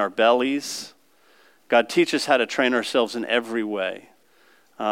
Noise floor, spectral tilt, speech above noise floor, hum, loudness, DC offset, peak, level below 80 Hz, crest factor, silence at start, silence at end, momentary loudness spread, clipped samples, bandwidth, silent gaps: -59 dBFS; -3 dB/octave; 37 dB; none; -22 LUFS; under 0.1%; -6 dBFS; -80 dBFS; 18 dB; 0 s; 0 s; 12 LU; under 0.1%; 16.5 kHz; none